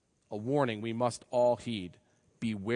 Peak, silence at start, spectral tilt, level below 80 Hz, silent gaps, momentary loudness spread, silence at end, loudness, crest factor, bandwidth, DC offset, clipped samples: -14 dBFS; 0.3 s; -6 dB/octave; -72 dBFS; none; 11 LU; 0 s; -32 LUFS; 18 dB; 10.5 kHz; under 0.1%; under 0.1%